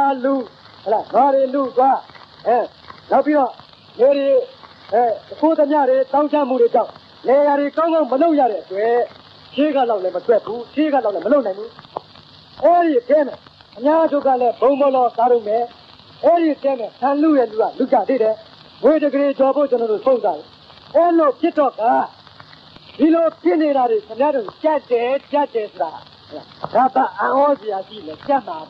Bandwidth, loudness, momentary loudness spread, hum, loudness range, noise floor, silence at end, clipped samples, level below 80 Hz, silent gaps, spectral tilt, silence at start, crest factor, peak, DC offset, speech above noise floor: 5.8 kHz; -17 LUFS; 11 LU; none; 3 LU; -44 dBFS; 0.05 s; under 0.1%; -66 dBFS; none; -7.5 dB/octave; 0 s; 14 dB; -4 dBFS; under 0.1%; 28 dB